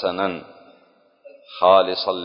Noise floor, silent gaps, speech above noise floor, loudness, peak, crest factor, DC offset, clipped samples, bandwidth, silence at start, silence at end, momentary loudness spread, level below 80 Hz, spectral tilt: -57 dBFS; none; 38 dB; -18 LUFS; -2 dBFS; 20 dB; under 0.1%; under 0.1%; 5.4 kHz; 0 s; 0 s; 20 LU; -62 dBFS; -8.5 dB/octave